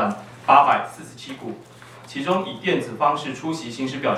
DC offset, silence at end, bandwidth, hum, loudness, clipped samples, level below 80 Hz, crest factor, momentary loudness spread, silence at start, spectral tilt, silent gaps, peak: under 0.1%; 0 s; 14 kHz; none; -21 LUFS; under 0.1%; -66 dBFS; 22 dB; 20 LU; 0 s; -5 dB/octave; none; 0 dBFS